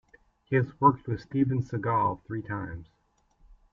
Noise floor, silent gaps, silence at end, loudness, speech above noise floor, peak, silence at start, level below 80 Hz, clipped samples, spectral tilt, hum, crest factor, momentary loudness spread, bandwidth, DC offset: -65 dBFS; none; 0.9 s; -28 LUFS; 37 dB; -8 dBFS; 0.5 s; -58 dBFS; under 0.1%; -10 dB/octave; none; 22 dB; 12 LU; 7 kHz; under 0.1%